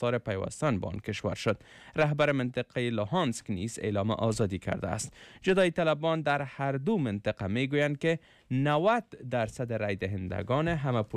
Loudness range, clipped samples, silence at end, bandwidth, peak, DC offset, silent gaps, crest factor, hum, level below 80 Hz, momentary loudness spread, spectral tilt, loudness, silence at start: 2 LU; under 0.1%; 0 s; 13 kHz; -16 dBFS; under 0.1%; none; 14 dB; none; -56 dBFS; 8 LU; -6 dB/octave; -30 LUFS; 0 s